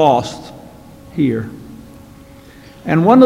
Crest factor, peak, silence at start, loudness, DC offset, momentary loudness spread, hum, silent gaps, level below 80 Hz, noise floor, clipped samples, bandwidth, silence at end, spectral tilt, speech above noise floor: 16 dB; 0 dBFS; 0 s; -18 LUFS; under 0.1%; 26 LU; none; none; -48 dBFS; -40 dBFS; under 0.1%; 13 kHz; 0 s; -7.5 dB/octave; 27 dB